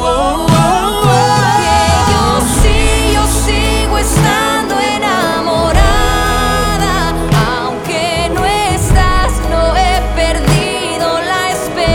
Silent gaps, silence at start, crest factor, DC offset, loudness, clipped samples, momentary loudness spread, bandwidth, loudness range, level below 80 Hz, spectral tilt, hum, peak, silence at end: none; 0 s; 12 dB; under 0.1%; -12 LUFS; under 0.1%; 4 LU; 18 kHz; 2 LU; -18 dBFS; -4.5 dB/octave; none; 0 dBFS; 0 s